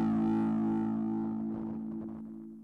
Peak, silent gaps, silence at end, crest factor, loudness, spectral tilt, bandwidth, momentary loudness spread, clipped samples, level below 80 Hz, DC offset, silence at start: -24 dBFS; none; 0 s; 10 dB; -33 LUFS; -10 dB/octave; 3.8 kHz; 13 LU; under 0.1%; -62 dBFS; under 0.1%; 0 s